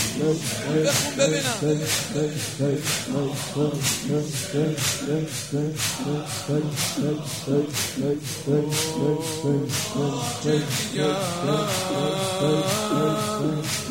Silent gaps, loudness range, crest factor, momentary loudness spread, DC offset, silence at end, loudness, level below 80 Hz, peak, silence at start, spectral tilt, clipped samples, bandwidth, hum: none; 2 LU; 16 dB; 5 LU; 0.2%; 0 s; -24 LUFS; -58 dBFS; -8 dBFS; 0 s; -4 dB/octave; under 0.1%; 16.5 kHz; none